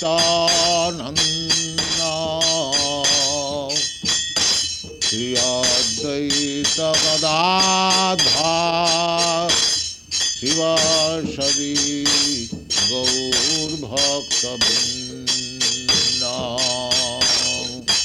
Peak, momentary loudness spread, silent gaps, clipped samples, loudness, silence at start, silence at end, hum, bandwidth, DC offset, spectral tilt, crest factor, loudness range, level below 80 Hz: -4 dBFS; 6 LU; none; under 0.1%; -17 LUFS; 0 s; 0 s; none; 16.5 kHz; under 0.1%; -1.5 dB/octave; 14 dB; 2 LU; -48 dBFS